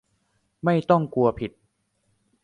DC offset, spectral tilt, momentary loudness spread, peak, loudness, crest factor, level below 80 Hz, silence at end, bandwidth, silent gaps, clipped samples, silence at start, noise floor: under 0.1%; -9 dB/octave; 14 LU; -6 dBFS; -23 LUFS; 20 dB; -54 dBFS; 0.95 s; 9.6 kHz; none; under 0.1%; 0.65 s; -71 dBFS